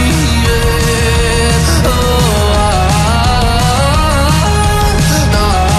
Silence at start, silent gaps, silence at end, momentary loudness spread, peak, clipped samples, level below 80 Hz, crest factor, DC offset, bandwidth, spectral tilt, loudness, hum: 0 s; none; 0 s; 1 LU; 0 dBFS; under 0.1%; -14 dBFS; 10 dB; under 0.1%; 14 kHz; -4.5 dB/octave; -11 LUFS; none